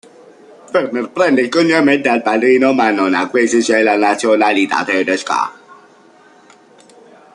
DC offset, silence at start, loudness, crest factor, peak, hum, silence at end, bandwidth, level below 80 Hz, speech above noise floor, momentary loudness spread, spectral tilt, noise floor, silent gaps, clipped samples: under 0.1%; 0.7 s; -14 LUFS; 14 dB; -2 dBFS; none; 1.8 s; 11 kHz; -62 dBFS; 32 dB; 7 LU; -4 dB/octave; -46 dBFS; none; under 0.1%